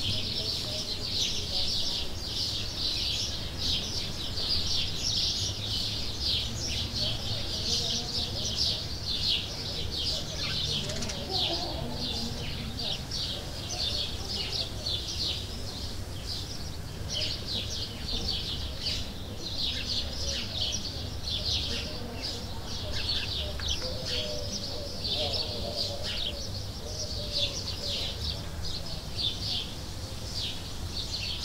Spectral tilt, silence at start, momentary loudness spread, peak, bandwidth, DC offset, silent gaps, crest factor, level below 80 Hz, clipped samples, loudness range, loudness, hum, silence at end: -3 dB/octave; 0 s; 8 LU; -14 dBFS; 16 kHz; under 0.1%; none; 18 dB; -42 dBFS; under 0.1%; 4 LU; -31 LUFS; none; 0 s